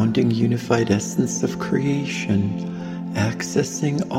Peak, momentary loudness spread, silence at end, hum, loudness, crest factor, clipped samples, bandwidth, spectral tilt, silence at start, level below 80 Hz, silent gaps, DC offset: -2 dBFS; 7 LU; 0 s; none; -22 LUFS; 18 dB; under 0.1%; 16 kHz; -5.5 dB/octave; 0 s; -54 dBFS; none; under 0.1%